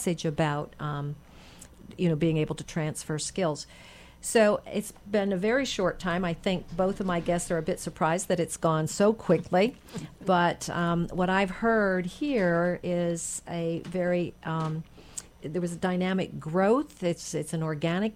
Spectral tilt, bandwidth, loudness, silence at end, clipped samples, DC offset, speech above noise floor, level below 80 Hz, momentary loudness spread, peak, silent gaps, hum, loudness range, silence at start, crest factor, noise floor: -5.5 dB/octave; 16 kHz; -28 LUFS; 0 s; under 0.1%; under 0.1%; 22 dB; -52 dBFS; 10 LU; -12 dBFS; none; none; 4 LU; 0 s; 16 dB; -50 dBFS